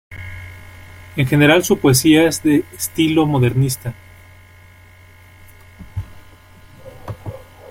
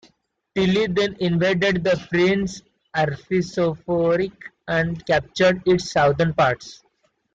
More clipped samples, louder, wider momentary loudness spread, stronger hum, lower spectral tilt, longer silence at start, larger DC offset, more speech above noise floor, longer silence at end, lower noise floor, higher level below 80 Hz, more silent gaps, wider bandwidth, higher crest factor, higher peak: neither; first, -15 LUFS vs -21 LUFS; first, 23 LU vs 10 LU; neither; about the same, -5 dB/octave vs -6 dB/octave; second, 0.1 s vs 0.55 s; neither; second, 30 dB vs 44 dB; second, 0.35 s vs 0.6 s; second, -44 dBFS vs -64 dBFS; first, -44 dBFS vs -50 dBFS; neither; first, 16.5 kHz vs 7.8 kHz; about the same, 18 dB vs 14 dB; first, -2 dBFS vs -8 dBFS